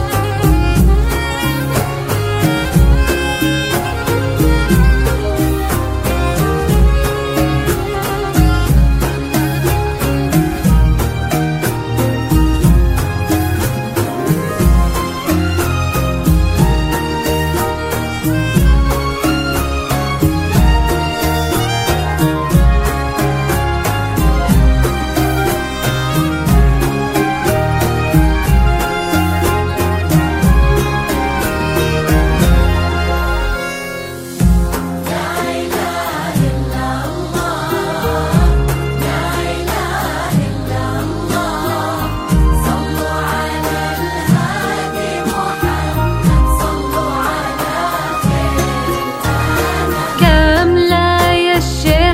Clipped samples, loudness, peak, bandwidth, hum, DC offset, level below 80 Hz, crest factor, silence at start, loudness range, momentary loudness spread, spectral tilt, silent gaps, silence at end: under 0.1%; -15 LUFS; 0 dBFS; 16.5 kHz; none; under 0.1%; -18 dBFS; 14 dB; 0 s; 3 LU; 6 LU; -5.5 dB/octave; none; 0 s